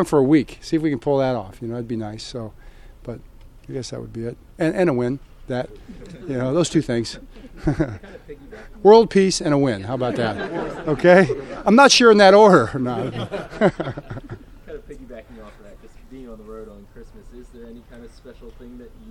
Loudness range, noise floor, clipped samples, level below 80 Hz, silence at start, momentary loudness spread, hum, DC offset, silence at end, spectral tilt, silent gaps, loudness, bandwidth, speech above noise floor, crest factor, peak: 14 LU; -43 dBFS; under 0.1%; -44 dBFS; 0 s; 27 LU; none; under 0.1%; 0 s; -5 dB/octave; none; -18 LUFS; 12.5 kHz; 25 dB; 20 dB; 0 dBFS